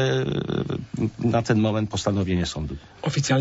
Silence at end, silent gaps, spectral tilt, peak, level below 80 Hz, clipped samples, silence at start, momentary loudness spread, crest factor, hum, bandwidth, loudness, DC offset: 0 s; none; -6 dB/octave; -6 dBFS; -44 dBFS; under 0.1%; 0 s; 8 LU; 18 dB; none; 8 kHz; -25 LUFS; under 0.1%